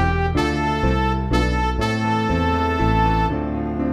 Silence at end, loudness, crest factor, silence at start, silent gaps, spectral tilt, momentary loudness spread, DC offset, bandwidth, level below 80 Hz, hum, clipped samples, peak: 0 s; -20 LUFS; 14 dB; 0 s; none; -7 dB/octave; 3 LU; under 0.1%; 13 kHz; -26 dBFS; none; under 0.1%; -6 dBFS